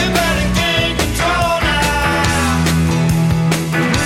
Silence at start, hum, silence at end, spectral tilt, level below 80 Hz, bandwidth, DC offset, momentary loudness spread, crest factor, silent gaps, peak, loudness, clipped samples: 0 s; none; 0 s; -4.5 dB/octave; -26 dBFS; 16.5 kHz; under 0.1%; 1 LU; 14 dB; none; 0 dBFS; -15 LUFS; under 0.1%